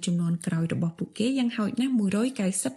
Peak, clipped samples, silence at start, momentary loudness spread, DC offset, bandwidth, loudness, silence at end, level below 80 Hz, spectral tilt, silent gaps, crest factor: -14 dBFS; under 0.1%; 0 s; 4 LU; under 0.1%; 12.5 kHz; -27 LUFS; 0 s; -66 dBFS; -5.5 dB/octave; none; 12 dB